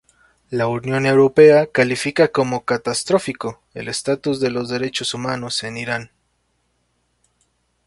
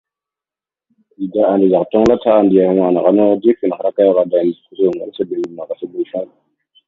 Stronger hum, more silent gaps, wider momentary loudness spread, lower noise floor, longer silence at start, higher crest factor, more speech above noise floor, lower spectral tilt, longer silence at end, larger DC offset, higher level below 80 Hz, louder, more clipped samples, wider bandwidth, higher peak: neither; neither; first, 15 LU vs 12 LU; second, -67 dBFS vs -89 dBFS; second, 0.5 s vs 1.2 s; about the same, 18 dB vs 14 dB; second, 49 dB vs 75 dB; second, -4.5 dB/octave vs -8.5 dB/octave; first, 1.8 s vs 0.6 s; neither; second, -58 dBFS vs -52 dBFS; second, -18 LUFS vs -15 LUFS; neither; first, 11.5 kHz vs 7.4 kHz; about the same, 0 dBFS vs 0 dBFS